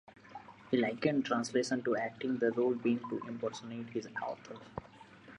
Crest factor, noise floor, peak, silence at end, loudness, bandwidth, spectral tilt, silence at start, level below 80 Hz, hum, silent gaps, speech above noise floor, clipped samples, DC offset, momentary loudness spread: 18 dB; -55 dBFS; -16 dBFS; 0 s; -35 LUFS; 10.5 kHz; -5.5 dB/octave; 0.1 s; -72 dBFS; none; none; 21 dB; under 0.1%; under 0.1%; 17 LU